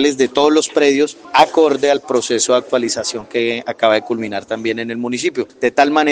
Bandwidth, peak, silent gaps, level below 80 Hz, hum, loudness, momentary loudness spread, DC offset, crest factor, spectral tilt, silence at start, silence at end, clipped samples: 10 kHz; 0 dBFS; none; -60 dBFS; none; -16 LUFS; 8 LU; under 0.1%; 16 dB; -3 dB/octave; 0 s; 0 s; under 0.1%